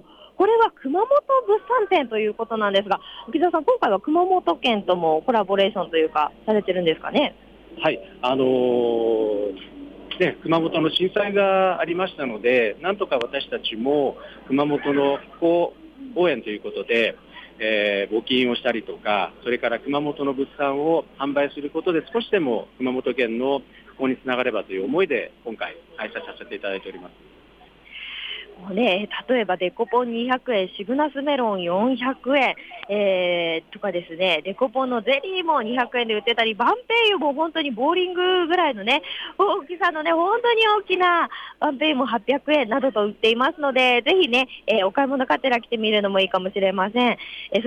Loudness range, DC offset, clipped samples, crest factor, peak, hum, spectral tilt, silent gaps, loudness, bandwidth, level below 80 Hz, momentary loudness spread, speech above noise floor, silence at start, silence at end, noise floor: 5 LU; under 0.1%; under 0.1%; 14 dB; -8 dBFS; none; -6 dB/octave; none; -22 LUFS; 9.2 kHz; -60 dBFS; 9 LU; 29 dB; 0.2 s; 0 s; -51 dBFS